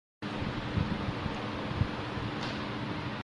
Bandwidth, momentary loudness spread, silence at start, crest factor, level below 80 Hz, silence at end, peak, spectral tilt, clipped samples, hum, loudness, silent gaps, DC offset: 11 kHz; 3 LU; 0.2 s; 18 dB; -46 dBFS; 0 s; -16 dBFS; -6.5 dB/octave; under 0.1%; none; -35 LUFS; none; under 0.1%